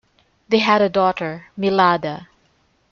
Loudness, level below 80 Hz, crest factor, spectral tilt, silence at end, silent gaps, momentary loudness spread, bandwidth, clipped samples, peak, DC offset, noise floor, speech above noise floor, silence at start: -18 LUFS; -60 dBFS; 18 dB; -6 dB/octave; 0.65 s; none; 13 LU; 7.2 kHz; under 0.1%; -2 dBFS; under 0.1%; -61 dBFS; 43 dB; 0.5 s